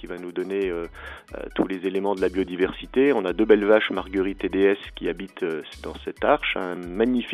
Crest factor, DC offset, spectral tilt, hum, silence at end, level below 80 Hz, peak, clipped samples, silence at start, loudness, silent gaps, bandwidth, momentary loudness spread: 20 dB; under 0.1%; -6.5 dB/octave; none; 0 s; -46 dBFS; -4 dBFS; under 0.1%; 0 s; -24 LUFS; none; 12 kHz; 13 LU